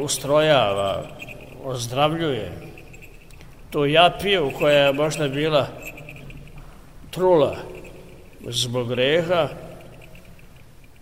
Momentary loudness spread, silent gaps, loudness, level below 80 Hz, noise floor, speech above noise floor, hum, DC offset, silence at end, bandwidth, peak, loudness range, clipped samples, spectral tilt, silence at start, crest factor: 23 LU; none; -20 LUFS; -46 dBFS; -47 dBFS; 27 dB; none; 0.4%; 0.45 s; 16 kHz; -2 dBFS; 5 LU; under 0.1%; -4.5 dB/octave; 0 s; 22 dB